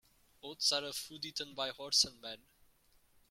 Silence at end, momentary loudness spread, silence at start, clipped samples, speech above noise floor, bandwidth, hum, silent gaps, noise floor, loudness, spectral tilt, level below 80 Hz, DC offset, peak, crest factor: 0.95 s; 20 LU; 0.45 s; under 0.1%; 32 dB; 16.5 kHz; none; none; -69 dBFS; -34 LUFS; 0 dB/octave; -72 dBFS; under 0.1%; -16 dBFS; 24 dB